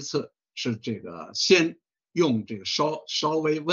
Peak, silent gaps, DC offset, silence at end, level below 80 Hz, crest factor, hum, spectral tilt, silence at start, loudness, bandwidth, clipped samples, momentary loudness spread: -6 dBFS; none; under 0.1%; 0 s; -72 dBFS; 20 dB; none; -4 dB/octave; 0 s; -25 LUFS; 7.8 kHz; under 0.1%; 14 LU